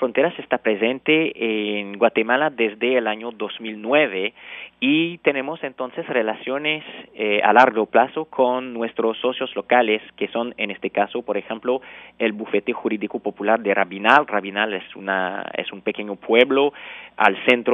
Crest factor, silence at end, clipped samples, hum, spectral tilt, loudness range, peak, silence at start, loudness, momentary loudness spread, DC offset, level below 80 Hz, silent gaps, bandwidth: 20 dB; 0 s; under 0.1%; none; -1.5 dB/octave; 4 LU; 0 dBFS; 0 s; -21 LUFS; 12 LU; under 0.1%; -70 dBFS; none; 7.2 kHz